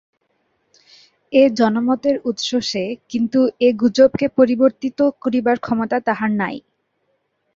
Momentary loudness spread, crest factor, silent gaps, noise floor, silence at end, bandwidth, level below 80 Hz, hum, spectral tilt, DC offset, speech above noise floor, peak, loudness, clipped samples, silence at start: 8 LU; 16 dB; none; -68 dBFS; 0.95 s; 7.6 kHz; -58 dBFS; none; -5.5 dB/octave; under 0.1%; 51 dB; -2 dBFS; -18 LUFS; under 0.1%; 1.3 s